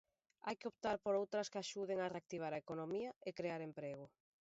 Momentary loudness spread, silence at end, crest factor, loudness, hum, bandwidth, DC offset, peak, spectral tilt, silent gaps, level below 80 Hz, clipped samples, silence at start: 10 LU; 0.35 s; 18 dB; -44 LUFS; none; 7.6 kHz; under 0.1%; -28 dBFS; -4 dB/octave; 3.16-3.21 s; -80 dBFS; under 0.1%; 0.45 s